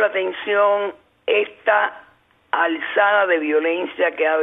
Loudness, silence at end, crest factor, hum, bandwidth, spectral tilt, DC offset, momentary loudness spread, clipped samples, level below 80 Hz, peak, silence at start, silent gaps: -19 LUFS; 0 s; 16 dB; none; 3.9 kHz; -6 dB/octave; under 0.1%; 7 LU; under 0.1%; -72 dBFS; -4 dBFS; 0 s; none